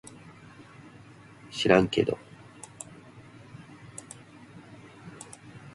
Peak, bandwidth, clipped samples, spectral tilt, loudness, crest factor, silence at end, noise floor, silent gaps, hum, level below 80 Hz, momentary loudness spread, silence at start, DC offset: -6 dBFS; 11.5 kHz; under 0.1%; -5 dB/octave; -26 LUFS; 26 dB; 0.05 s; -51 dBFS; none; none; -60 dBFS; 28 LU; 1.5 s; under 0.1%